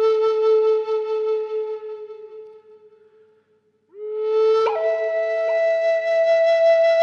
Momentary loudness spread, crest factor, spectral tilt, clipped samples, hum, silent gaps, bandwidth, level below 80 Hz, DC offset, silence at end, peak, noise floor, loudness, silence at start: 18 LU; 12 dB; -2 dB/octave; under 0.1%; none; none; 7 kHz; -82 dBFS; under 0.1%; 0 s; -8 dBFS; -63 dBFS; -19 LUFS; 0 s